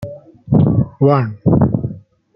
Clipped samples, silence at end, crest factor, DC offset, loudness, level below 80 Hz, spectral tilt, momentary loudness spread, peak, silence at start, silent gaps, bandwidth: under 0.1%; 0.35 s; 14 dB; under 0.1%; -15 LUFS; -40 dBFS; -12 dB/octave; 10 LU; -2 dBFS; 0 s; none; 5.4 kHz